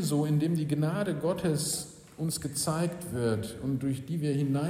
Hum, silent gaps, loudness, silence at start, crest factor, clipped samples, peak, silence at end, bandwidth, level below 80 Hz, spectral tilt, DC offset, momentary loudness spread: none; none; -30 LUFS; 0 s; 14 dB; under 0.1%; -16 dBFS; 0 s; 16 kHz; -58 dBFS; -5.5 dB/octave; under 0.1%; 6 LU